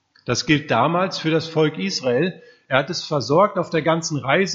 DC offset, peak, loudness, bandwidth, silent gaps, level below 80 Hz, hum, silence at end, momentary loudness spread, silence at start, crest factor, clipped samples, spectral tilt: under 0.1%; 0 dBFS; -20 LUFS; 7.8 kHz; none; -58 dBFS; none; 0 s; 6 LU; 0.25 s; 20 dB; under 0.1%; -5 dB/octave